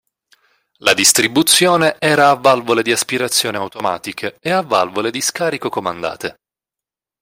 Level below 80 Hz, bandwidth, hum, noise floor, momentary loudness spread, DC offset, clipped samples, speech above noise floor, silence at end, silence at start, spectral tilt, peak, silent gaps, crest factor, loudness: -60 dBFS; 16.5 kHz; none; -88 dBFS; 13 LU; under 0.1%; under 0.1%; 72 dB; 0.9 s; 0.85 s; -2 dB/octave; 0 dBFS; none; 16 dB; -15 LUFS